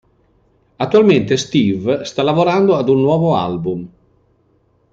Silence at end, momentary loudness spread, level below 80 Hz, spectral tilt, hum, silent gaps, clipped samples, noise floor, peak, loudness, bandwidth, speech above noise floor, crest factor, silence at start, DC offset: 1.05 s; 10 LU; -54 dBFS; -6.5 dB/octave; none; none; under 0.1%; -58 dBFS; -2 dBFS; -15 LUFS; 7.8 kHz; 44 dB; 14 dB; 0.8 s; under 0.1%